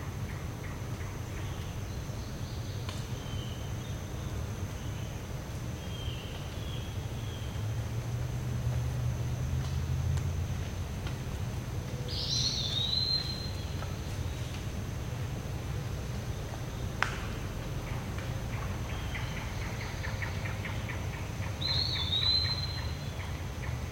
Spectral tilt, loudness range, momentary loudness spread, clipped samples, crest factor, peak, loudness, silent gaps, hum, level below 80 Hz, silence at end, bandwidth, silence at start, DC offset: -4.5 dB/octave; 7 LU; 10 LU; under 0.1%; 30 dB; -4 dBFS; -35 LUFS; none; none; -44 dBFS; 0 s; 16.5 kHz; 0 s; under 0.1%